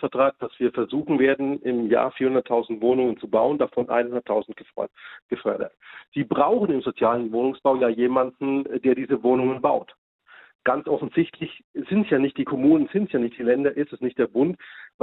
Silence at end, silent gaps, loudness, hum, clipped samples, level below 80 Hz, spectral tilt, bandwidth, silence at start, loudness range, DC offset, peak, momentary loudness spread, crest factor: 0.15 s; 5.22-5.29 s, 6.08-6.12 s, 9.98-10.19 s, 10.55-10.59 s, 11.64-11.74 s; -23 LUFS; none; under 0.1%; -64 dBFS; -10 dB/octave; 4.1 kHz; 0 s; 3 LU; under 0.1%; -6 dBFS; 10 LU; 18 dB